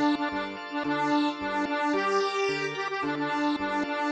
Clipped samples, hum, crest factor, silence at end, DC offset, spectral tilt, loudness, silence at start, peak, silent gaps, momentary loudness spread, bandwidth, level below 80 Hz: under 0.1%; none; 14 dB; 0 s; under 0.1%; -4.5 dB/octave; -28 LUFS; 0 s; -14 dBFS; none; 5 LU; 8.8 kHz; -64 dBFS